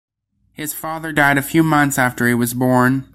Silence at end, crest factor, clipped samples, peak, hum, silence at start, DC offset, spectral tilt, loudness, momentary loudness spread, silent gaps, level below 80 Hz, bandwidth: 0.1 s; 16 dB; under 0.1%; -2 dBFS; none; 0.6 s; under 0.1%; -5 dB/octave; -16 LUFS; 11 LU; none; -50 dBFS; 16.5 kHz